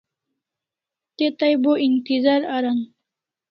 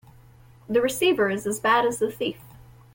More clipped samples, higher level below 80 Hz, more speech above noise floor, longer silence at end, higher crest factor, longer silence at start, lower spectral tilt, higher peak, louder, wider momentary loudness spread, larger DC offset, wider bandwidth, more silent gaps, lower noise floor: neither; second, -72 dBFS vs -58 dBFS; first, 68 dB vs 28 dB; first, 0.65 s vs 0.35 s; about the same, 16 dB vs 16 dB; first, 1.2 s vs 0.7 s; first, -7 dB/octave vs -3.5 dB/octave; first, -6 dBFS vs -10 dBFS; first, -20 LUFS vs -23 LUFS; second, 6 LU vs 10 LU; neither; second, 5.8 kHz vs 17 kHz; neither; first, -88 dBFS vs -51 dBFS